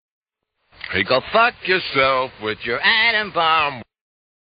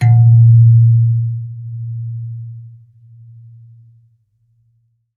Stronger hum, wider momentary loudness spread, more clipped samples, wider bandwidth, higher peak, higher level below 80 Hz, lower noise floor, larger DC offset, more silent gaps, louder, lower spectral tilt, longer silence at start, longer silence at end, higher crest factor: neither; second, 10 LU vs 20 LU; neither; first, 5.2 kHz vs 2.2 kHz; about the same, -4 dBFS vs -2 dBFS; about the same, -54 dBFS vs -58 dBFS; first, -72 dBFS vs -60 dBFS; neither; neither; second, -18 LUFS vs -11 LUFS; second, 0 dB/octave vs -10 dB/octave; first, 0.85 s vs 0 s; second, 0.6 s vs 2.5 s; first, 18 dB vs 12 dB